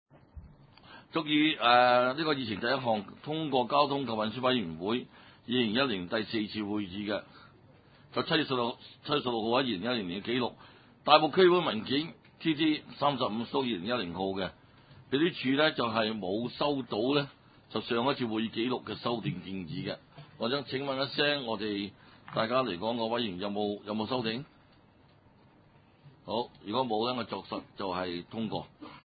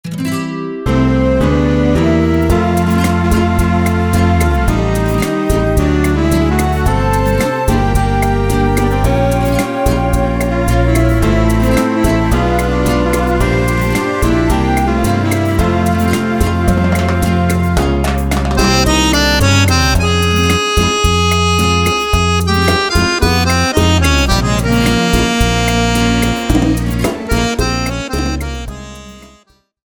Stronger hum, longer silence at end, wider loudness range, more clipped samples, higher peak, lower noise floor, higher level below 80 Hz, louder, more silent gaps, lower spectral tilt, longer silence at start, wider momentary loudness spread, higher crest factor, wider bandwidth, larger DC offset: neither; second, 0.1 s vs 0.65 s; first, 8 LU vs 2 LU; neither; second, -6 dBFS vs 0 dBFS; first, -61 dBFS vs -50 dBFS; second, -64 dBFS vs -20 dBFS; second, -31 LUFS vs -13 LUFS; neither; first, -9 dB/octave vs -5.5 dB/octave; first, 0.35 s vs 0.05 s; first, 12 LU vs 4 LU; first, 26 dB vs 12 dB; second, 5 kHz vs over 20 kHz; neither